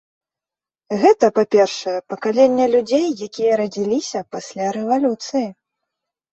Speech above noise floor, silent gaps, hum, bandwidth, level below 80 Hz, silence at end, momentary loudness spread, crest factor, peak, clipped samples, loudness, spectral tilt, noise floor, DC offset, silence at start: 72 dB; none; none; 8.2 kHz; -64 dBFS; 0.8 s; 11 LU; 18 dB; -2 dBFS; under 0.1%; -18 LUFS; -5 dB/octave; -90 dBFS; under 0.1%; 0.9 s